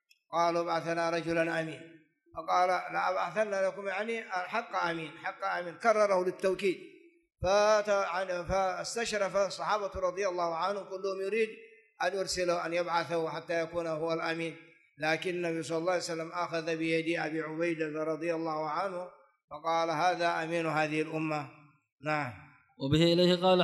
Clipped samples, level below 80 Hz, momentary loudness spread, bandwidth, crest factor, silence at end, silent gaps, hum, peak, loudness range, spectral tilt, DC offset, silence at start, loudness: under 0.1%; -60 dBFS; 9 LU; 12 kHz; 20 dB; 0 s; 19.44-19.48 s, 21.92-21.97 s; none; -12 dBFS; 3 LU; -4.5 dB/octave; under 0.1%; 0.3 s; -31 LUFS